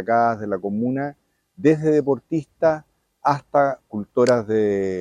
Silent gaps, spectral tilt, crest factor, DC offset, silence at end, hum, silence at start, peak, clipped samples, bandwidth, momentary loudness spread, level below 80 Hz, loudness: none; -7 dB/octave; 18 dB; under 0.1%; 0 s; none; 0 s; -4 dBFS; under 0.1%; 11.5 kHz; 9 LU; -62 dBFS; -21 LUFS